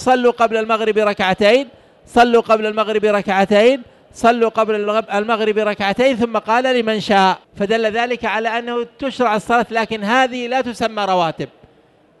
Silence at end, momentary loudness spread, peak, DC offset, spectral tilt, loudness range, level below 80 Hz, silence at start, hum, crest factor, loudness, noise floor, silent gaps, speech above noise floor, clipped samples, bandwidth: 0.75 s; 7 LU; -2 dBFS; under 0.1%; -5 dB/octave; 3 LU; -52 dBFS; 0 s; none; 14 dB; -16 LUFS; -52 dBFS; none; 36 dB; under 0.1%; 12 kHz